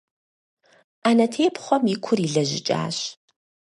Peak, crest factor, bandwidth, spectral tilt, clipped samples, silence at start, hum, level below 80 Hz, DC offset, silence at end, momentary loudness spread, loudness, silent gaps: -4 dBFS; 20 dB; 11.5 kHz; -5 dB/octave; under 0.1%; 1.05 s; none; -70 dBFS; under 0.1%; 0.65 s; 8 LU; -22 LUFS; none